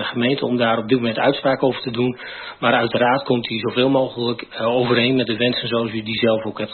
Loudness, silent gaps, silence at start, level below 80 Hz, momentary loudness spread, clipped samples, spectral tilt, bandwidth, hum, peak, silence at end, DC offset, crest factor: -19 LUFS; none; 0 s; -58 dBFS; 6 LU; under 0.1%; -11 dB/octave; 4.5 kHz; none; -4 dBFS; 0 s; under 0.1%; 16 dB